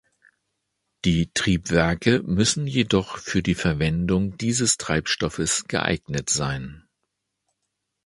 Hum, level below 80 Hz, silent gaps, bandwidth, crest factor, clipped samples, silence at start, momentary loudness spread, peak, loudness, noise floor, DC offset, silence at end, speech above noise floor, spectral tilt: none; -42 dBFS; none; 11.5 kHz; 22 dB; under 0.1%; 1.05 s; 5 LU; -2 dBFS; -23 LUFS; -79 dBFS; under 0.1%; 1.25 s; 56 dB; -4 dB/octave